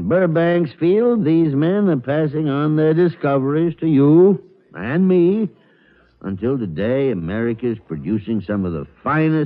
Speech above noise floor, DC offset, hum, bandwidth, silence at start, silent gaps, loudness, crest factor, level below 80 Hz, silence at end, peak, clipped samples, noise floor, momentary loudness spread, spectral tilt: 37 dB; under 0.1%; none; 4.8 kHz; 0 s; none; -18 LUFS; 14 dB; -52 dBFS; 0 s; -4 dBFS; under 0.1%; -54 dBFS; 10 LU; -12 dB/octave